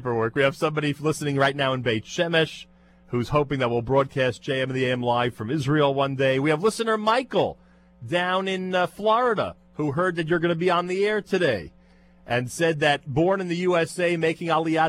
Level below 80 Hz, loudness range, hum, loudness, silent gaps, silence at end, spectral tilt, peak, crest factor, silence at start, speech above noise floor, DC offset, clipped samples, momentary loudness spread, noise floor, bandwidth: -54 dBFS; 2 LU; none; -24 LUFS; none; 0 s; -5.5 dB/octave; -8 dBFS; 16 dB; 0 s; 31 dB; under 0.1%; under 0.1%; 6 LU; -54 dBFS; 15 kHz